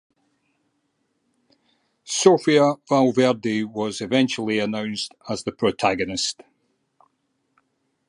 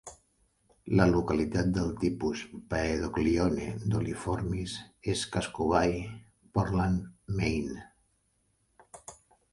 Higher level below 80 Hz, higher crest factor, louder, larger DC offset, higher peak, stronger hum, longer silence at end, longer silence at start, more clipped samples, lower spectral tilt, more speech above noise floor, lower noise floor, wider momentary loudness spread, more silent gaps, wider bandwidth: second, -62 dBFS vs -46 dBFS; about the same, 22 dB vs 22 dB; first, -21 LUFS vs -30 LUFS; neither; first, -2 dBFS vs -8 dBFS; neither; first, 1.75 s vs 0.4 s; first, 2.05 s vs 0.05 s; neither; second, -4.5 dB/octave vs -6.5 dB/octave; first, 51 dB vs 44 dB; about the same, -72 dBFS vs -73 dBFS; second, 12 LU vs 18 LU; neither; about the same, 11.5 kHz vs 11.5 kHz